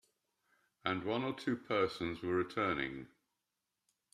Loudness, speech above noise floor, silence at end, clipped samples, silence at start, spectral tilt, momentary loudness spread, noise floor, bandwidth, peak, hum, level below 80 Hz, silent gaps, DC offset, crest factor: -37 LUFS; 51 dB; 1.05 s; under 0.1%; 0.85 s; -6 dB/octave; 7 LU; -88 dBFS; 13 kHz; -18 dBFS; none; -70 dBFS; none; under 0.1%; 22 dB